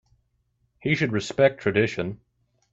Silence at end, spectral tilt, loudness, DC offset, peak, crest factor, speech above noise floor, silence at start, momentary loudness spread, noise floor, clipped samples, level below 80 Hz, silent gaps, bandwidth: 0.55 s; -6 dB/octave; -24 LUFS; under 0.1%; -6 dBFS; 20 dB; 47 dB; 0.85 s; 12 LU; -71 dBFS; under 0.1%; -60 dBFS; none; 7.8 kHz